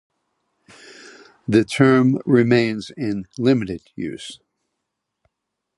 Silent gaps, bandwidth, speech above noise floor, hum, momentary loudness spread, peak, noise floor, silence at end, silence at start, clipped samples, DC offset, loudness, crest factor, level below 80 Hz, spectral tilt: none; 11.5 kHz; 61 dB; none; 16 LU; -2 dBFS; -80 dBFS; 1.45 s; 1.05 s; under 0.1%; under 0.1%; -19 LUFS; 20 dB; -56 dBFS; -7 dB/octave